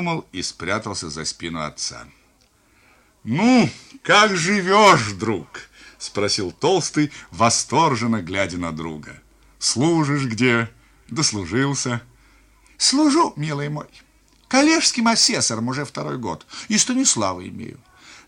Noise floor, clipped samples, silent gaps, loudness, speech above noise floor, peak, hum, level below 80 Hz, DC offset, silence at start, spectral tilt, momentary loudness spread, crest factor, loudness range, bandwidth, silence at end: -58 dBFS; under 0.1%; none; -19 LUFS; 38 dB; -2 dBFS; none; -54 dBFS; under 0.1%; 0 s; -3.5 dB/octave; 16 LU; 20 dB; 4 LU; 16 kHz; 0.1 s